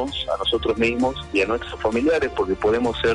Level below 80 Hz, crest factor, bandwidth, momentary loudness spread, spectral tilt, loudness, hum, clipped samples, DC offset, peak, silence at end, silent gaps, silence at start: -40 dBFS; 12 dB; 10.5 kHz; 4 LU; -5 dB/octave; -22 LUFS; none; under 0.1%; under 0.1%; -10 dBFS; 0 s; none; 0 s